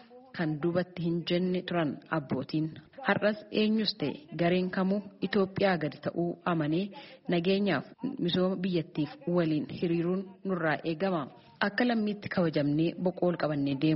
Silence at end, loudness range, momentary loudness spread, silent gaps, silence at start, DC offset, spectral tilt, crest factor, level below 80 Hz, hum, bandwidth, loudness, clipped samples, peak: 0 s; 1 LU; 7 LU; none; 0.1 s; under 0.1%; -5 dB/octave; 20 dB; -68 dBFS; none; 5.8 kHz; -30 LUFS; under 0.1%; -10 dBFS